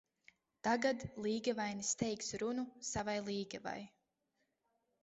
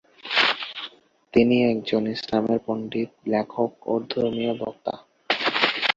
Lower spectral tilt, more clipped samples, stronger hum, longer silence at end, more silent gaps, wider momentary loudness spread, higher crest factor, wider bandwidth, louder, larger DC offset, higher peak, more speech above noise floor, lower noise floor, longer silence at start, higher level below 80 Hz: second, -3.5 dB/octave vs -5.5 dB/octave; neither; neither; first, 1.15 s vs 0.05 s; neither; about the same, 10 LU vs 12 LU; about the same, 20 dB vs 22 dB; about the same, 8.2 kHz vs 7.6 kHz; second, -39 LUFS vs -24 LUFS; neither; second, -22 dBFS vs -2 dBFS; first, 45 dB vs 21 dB; first, -84 dBFS vs -44 dBFS; first, 0.65 s vs 0.25 s; second, -68 dBFS vs -62 dBFS